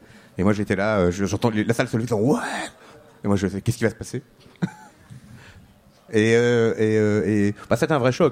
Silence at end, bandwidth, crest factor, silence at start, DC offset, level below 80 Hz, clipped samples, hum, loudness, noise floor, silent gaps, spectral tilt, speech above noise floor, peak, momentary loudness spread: 0 s; 15.5 kHz; 18 dB; 0.35 s; under 0.1%; -52 dBFS; under 0.1%; none; -22 LUFS; -52 dBFS; none; -6.5 dB/octave; 31 dB; -4 dBFS; 12 LU